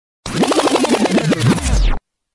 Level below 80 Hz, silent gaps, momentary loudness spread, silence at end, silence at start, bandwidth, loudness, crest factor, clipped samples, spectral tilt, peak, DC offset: -22 dBFS; none; 8 LU; 0.35 s; 0.25 s; 12 kHz; -16 LUFS; 14 dB; under 0.1%; -5 dB/octave; -2 dBFS; under 0.1%